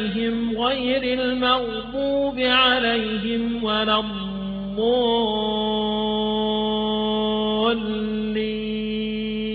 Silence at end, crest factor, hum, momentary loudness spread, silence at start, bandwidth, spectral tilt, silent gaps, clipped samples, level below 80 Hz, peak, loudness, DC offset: 0 s; 16 dB; none; 7 LU; 0 s; 5 kHz; -8 dB/octave; none; under 0.1%; -46 dBFS; -6 dBFS; -22 LUFS; under 0.1%